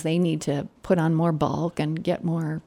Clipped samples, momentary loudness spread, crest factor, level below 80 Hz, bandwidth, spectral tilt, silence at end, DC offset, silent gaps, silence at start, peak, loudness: under 0.1%; 5 LU; 16 dB; -56 dBFS; 11.5 kHz; -7.5 dB/octave; 0.05 s; under 0.1%; none; 0 s; -8 dBFS; -25 LUFS